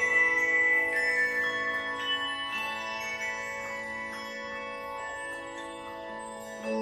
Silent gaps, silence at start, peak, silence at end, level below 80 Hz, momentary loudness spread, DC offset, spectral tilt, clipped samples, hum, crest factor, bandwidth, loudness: none; 0 s; -14 dBFS; 0 s; -64 dBFS; 17 LU; under 0.1%; -2 dB/octave; under 0.1%; none; 16 dB; 13.5 kHz; -29 LUFS